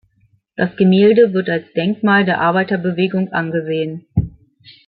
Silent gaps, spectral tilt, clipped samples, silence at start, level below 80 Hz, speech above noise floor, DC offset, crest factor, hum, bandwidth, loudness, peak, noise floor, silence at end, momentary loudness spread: none; -12 dB/octave; under 0.1%; 0.6 s; -44 dBFS; 43 dB; under 0.1%; 16 dB; none; 4.7 kHz; -16 LUFS; -2 dBFS; -58 dBFS; 0.6 s; 11 LU